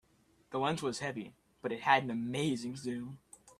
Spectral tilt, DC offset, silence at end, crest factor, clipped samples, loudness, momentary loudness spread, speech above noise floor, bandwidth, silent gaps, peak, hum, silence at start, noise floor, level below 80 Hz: -5 dB/octave; under 0.1%; 0.1 s; 24 dB; under 0.1%; -35 LUFS; 16 LU; 34 dB; 14 kHz; none; -12 dBFS; none; 0.5 s; -69 dBFS; -72 dBFS